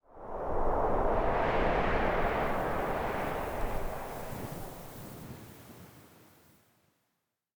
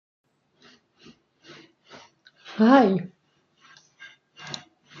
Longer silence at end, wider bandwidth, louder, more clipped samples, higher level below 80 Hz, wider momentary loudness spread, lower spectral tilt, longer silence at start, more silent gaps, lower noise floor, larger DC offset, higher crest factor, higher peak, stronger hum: second, 0 s vs 0.4 s; first, over 20 kHz vs 7.2 kHz; second, -33 LUFS vs -19 LUFS; neither; first, -40 dBFS vs -76 dBFS; second, 18 LU vs 25 LU; about the same, -6 dB/octave vs -5 dB/octave; second, 0 s vs 2.5 s; neither; first, -83 dBFS vs -66 dBFS; neither; second, 16 dB vs 24 dB; second, -16 dBFS vs -4 dBFS; neither